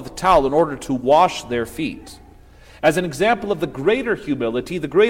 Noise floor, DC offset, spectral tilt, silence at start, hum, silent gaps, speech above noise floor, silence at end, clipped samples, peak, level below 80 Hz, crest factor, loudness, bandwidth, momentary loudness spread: -45 dBFS; under 0.1%; -5 dB/octave; 0 s; none; none; 26 dB; 0 s; under 0.1%; -2 dBFS; -42 dBFS; 16 dB; -19 LUFS; 16.5 kHz; 10 LU